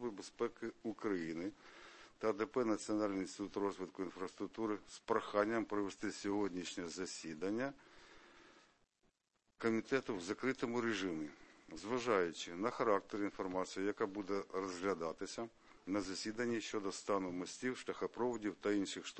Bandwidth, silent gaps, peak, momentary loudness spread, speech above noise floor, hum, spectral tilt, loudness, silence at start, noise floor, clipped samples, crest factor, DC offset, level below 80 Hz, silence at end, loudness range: 8.4 kHz; none; -20 dBFS; 10 LU; 42 dB; none; -4.5 dB/octave; -41 LUFS; 0 s; -82 dBFS; under 0.1%; 22 dB; under 0.1%; -74 dBFS; 0 s; 4 LU